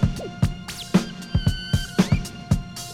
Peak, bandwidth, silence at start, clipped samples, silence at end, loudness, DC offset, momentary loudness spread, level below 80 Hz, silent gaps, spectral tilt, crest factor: -4 dBFS; 16 kHz; 0 s; under 0.1%; 0 s; -25 LUFS; under 0.1%; 4 LU; -32 dBFS; none; -6 dB/octave; 20 dB